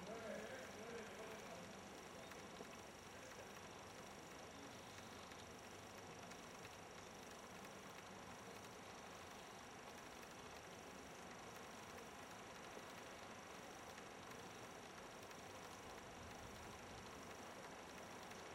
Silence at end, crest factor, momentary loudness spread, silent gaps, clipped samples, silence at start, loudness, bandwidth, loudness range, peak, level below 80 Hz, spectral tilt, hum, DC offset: 0 s; 16 dB; 3 LU; none; under 0.1%; 0 s; -56 LUFS; 16 kHz; 1 LU; -40 dBFS; -76 dBFS; -3 dB/octave; none; under 0.1%